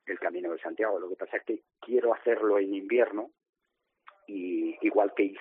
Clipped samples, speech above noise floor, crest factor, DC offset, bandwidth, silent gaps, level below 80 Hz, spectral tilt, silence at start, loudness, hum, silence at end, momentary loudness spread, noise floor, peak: under 0.1%; 53 dB; 20 dB; under 0.1%; 3.8 kHz; 3.49-3.53 s; -86 dBFS; -3 dB/octave; 0.05 s; -29 LUFS; none; 0 s; 12 LU; -82 dBFS; -10 dBFS